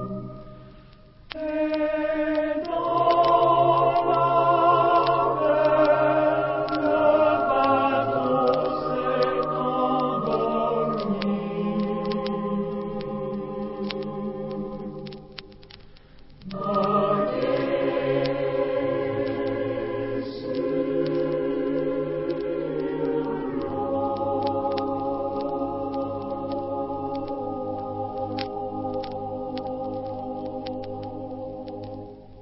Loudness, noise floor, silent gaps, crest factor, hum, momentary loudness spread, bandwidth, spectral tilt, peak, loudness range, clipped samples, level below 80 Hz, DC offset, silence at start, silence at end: -25 LUFS; -49 dBFS; none; 18 dB; none; 14 LU; 5.8 kHz; -10.5 dB/octave; -6 dBFS; 11 LU; under 0.1%; -52 dBFS; under 0.1%; 0 s; 0 s